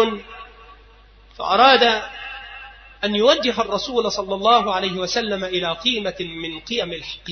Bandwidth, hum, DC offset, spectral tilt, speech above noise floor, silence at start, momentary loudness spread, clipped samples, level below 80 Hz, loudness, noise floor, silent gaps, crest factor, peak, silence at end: 6.6 kHz; none; under 0.1%; -3.5 dB/octave; 28 dB; 0 s; 18 LU; under 0.1%; -50 dBFS; -19 LUFS; -48 dBFS; none; 20 dB; 0 dBFS; 0 s